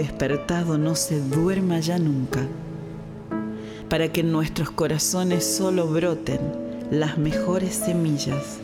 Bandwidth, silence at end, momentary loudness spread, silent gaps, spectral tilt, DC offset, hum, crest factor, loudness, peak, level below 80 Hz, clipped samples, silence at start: 17 kHz; 0 s; 10 LU; none; -5 dB/octave; under 0.1%; none; 16 dB; -24 LUFS; -6 dBFS; -46 dBFS; under 0.1%; 0 s